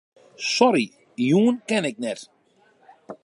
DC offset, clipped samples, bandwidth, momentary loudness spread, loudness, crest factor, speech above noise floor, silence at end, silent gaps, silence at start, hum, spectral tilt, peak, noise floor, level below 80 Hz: under 0.1%; under 0.1%; 11.5 kHz; 13 LU; -22 LUFS; 20 dB; 39 dB; 0.1 s; none; 0.4 s; none; -5 dB/octave; -4 dBFS; -60 dBFS; -76 dBFS